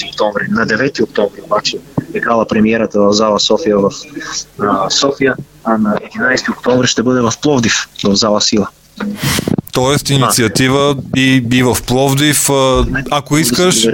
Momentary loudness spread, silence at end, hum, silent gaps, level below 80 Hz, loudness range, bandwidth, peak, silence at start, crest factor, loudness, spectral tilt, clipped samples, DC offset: 7 LU; 0 s; none; none; -34 dBFS; 3 LU; 17 kHz; 0 dBFS; 0 s; 12 dB; -13 LUFS; -4 dB/octave; under 0.1%; under 0.1%